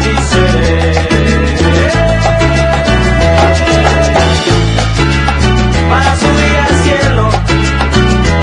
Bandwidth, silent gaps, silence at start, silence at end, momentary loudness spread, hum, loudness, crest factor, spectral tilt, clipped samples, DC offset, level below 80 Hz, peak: 10.5 kHz; none; 0 s; 0 s; 2 LU; none; -9 LUFS; 8 dB; -5.5 dB/octave; 0.3%; under 0.1%; -16 dBFS; 0 dBFS